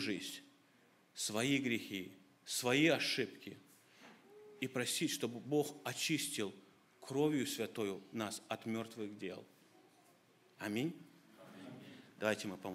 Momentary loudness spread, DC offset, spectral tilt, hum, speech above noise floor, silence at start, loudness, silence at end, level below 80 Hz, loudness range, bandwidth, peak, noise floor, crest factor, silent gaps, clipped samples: 20 LU; under 0.1%; -3.5 dB/octave; none; 31 dB; 0 s; -39 LUFS; 0 s; -86 dBFS; 8 LU; 16 kHz; -18 dBFS; -70 dBFS; 24 dB; none; under 0.1%